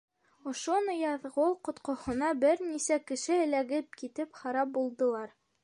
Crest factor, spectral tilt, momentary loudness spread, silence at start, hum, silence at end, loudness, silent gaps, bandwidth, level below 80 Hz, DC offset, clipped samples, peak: 16 dB; -3 dB/octave; 11 LU; 0.45 s; none; 0.35 s; -32 LUFS; none; 11 kHz; -66 dBFS; under 0.1%; under 0.1%; -16 dBFS